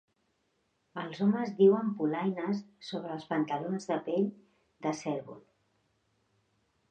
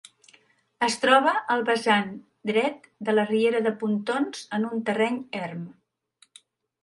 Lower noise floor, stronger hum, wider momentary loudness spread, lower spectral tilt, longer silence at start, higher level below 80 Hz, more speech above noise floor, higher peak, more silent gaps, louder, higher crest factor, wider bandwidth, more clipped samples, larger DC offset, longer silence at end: first, -76 dBFS vs -63 dBFS; neither; about the same, 16 LU vs 14 LU; first, -7 dB/octave vs -4.5 dB/octave; first, 0.95 s vs 0.8 s; second, -80 dBFS vs -74 dBFS; first, 46 dB vs 39 dB; second, -12 dBFS vs -4 dBFS; neither; second, -32 LUFS vs -25 LUFS; about the same, 20 dB vs 22 dB; second, 8.8 kHz vs 11.5 kHz; neither; neither; first, 1.5 s vs 1.1 s